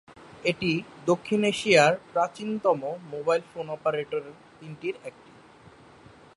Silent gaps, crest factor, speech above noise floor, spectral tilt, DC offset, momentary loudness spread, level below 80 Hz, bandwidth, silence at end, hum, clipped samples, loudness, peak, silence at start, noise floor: none; 22 dB; 26 dB; -4.5 dB/octave; under 0.1%; 17 LU; -66 dBFS; 11.5 kHz; 1.25 s; none; under 0.1%; -26 LUFS; -6 dBFS; 0.1 s; -52 dBFS